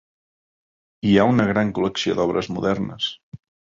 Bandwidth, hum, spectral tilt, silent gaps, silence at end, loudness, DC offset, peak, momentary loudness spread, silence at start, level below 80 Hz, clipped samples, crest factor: 7.6 kHz; none; -6 dB/octave; 3.23-3.32 s; 0.4 s; -21 LUFS; under 0.1%; -2 dBFS; 10 LU; 1.05 s; -50 dBFS; under 0.1%; 20 dB